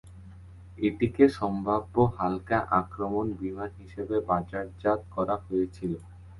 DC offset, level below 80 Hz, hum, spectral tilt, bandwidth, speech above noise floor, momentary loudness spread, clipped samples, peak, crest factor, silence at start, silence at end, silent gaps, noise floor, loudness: under 0.1%; -50 dBFS; none; -8.5 dB/octave; 11.5 kHz; 19 dB; 14 LU; under 0.1%; -6 dBFS; 22 dB; 0.05 s; 0 s; none; -47 dBFS; -28 LUFS